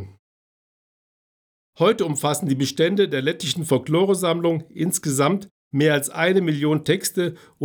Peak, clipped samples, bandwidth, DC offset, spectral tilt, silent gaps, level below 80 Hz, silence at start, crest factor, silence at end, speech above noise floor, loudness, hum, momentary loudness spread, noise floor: -6 dBFS; under 0.1%; over 20 kHz; under 0.1%; -4.5 dB/octave; 0.19-1.73 s, 5.51-5.71 s; -70 dBFS; 0 s; 16 dB; 0 s; over 69 dB; -21 LUFS; none; 5 LU; under -90 dBFS